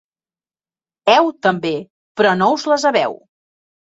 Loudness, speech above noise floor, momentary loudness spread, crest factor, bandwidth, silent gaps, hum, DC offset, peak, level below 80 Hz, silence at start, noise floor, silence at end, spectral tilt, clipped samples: -16 LUFS; over 75 dB; 10 LU; 18 dB; 8 kHz; 1.90-2.15 s; none; under 0.1%; -2 dBFS; -64 dBFS; 1.05 s; under -90 dBFS; 0.7 s; -4.5 dB/octave; under 0.1%